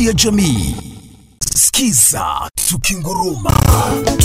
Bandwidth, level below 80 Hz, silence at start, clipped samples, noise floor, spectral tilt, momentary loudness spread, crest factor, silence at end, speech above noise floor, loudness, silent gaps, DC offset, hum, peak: 16.5 kHz; -26 dBFS; 0 s; under 0.1%; -37 dBFS; -3.5 dB/octave; 9 LU; 14 dB; 0 s; 24 dB; -13 LUFS; none; under 0.1%; none; 0 dBFS